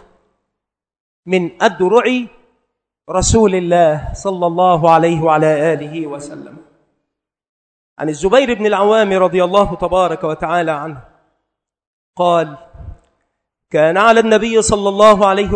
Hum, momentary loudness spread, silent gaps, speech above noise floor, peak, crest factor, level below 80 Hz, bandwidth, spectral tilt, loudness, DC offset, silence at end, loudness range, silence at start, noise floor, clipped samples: none; 13 LU; 7.49-7.96 s, 11.87-12.13 s; 68 dB; 0 dBFS; 14 dB; -38 dBFS; 11 kHz; -5 dB/octave; -13 LUFS; under 0.1%; 0 s; 6 LU; 1.25 s; -81 dBFS; 0.2%